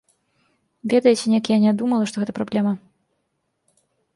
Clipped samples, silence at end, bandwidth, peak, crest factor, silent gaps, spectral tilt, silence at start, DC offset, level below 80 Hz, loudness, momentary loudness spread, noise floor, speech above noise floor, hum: under 0.1%; 1.4 s; 11.5 kHz; -4 dBFS; 18 dB; none; -6 dB/octave; 0.85 s; under 0.1%; -66 dBFS; -20 LUFS; 9 LU; -73 dBFS; 54 dB; none